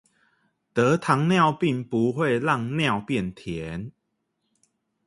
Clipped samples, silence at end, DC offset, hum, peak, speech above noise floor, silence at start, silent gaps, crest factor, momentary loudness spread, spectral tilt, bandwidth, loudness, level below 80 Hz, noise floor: under 0.1%; 1.15 s; under 0.1%; none; -4 dBFS; 53 dB; 0.75 s; none; 22 dB; 13 LU; -6.5 dB/octave; 11.5 kHz; -24 LUFS; -56 dBFS; -76 dBFS